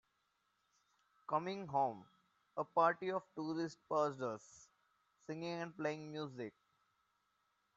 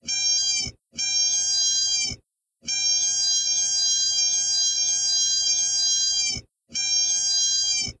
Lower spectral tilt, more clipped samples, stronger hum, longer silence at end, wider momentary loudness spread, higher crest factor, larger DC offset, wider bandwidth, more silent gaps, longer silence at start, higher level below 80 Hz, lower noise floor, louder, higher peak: first, -4.5 dB/octave vs 2.5 dB/octave; neither; neither; first, 1.25 s vs 0.1 s; first, 16 LU vs 8 LU; first, 22 dB vs 12 dB; neither; second, 8 kHz vs 11 kHz; neither; first, 1.3 s vs 0.05 s; second, -88 dBFS vs -56 dBFS; first, -82 dBFS vs -59 dBFS; second, -41 LUFS vs -20 LUFS; second, -20 dBFS vs -12 dBFS